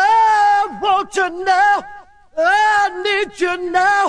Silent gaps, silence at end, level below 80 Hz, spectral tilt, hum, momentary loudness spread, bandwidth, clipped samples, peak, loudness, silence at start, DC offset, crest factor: none; 0 s; -54 dBFS; -2 dB/octave; none; 7 LU; 10.5 kHz; under 0.1%; -2 dBFS; -15 LUFS; 0 s; under 0.1%; 12 dB